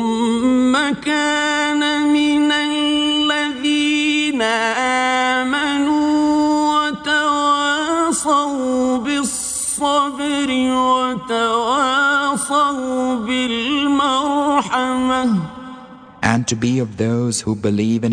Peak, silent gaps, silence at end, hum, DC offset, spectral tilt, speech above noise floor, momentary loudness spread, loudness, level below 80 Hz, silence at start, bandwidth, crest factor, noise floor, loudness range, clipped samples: -2 dBFS; none; 0 s; none; under 0.1%; -3.5 dB/octave; 20 dB; 4 LU; -17 LUFS; -52 dBFS; 0 s; 10 kHz; 16 dB; -38 dBFS; 2 LU; under 0.1%